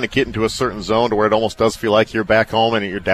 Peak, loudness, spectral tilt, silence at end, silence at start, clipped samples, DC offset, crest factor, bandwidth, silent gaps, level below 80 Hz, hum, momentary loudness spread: -2 dBFS; -17 LUFS; -5 dB/octave; 0 s; 0 s; under 0.1%; under 0.1%; 16 dB; 14.5 kHz; none; -42 dBFS; none; 4 LU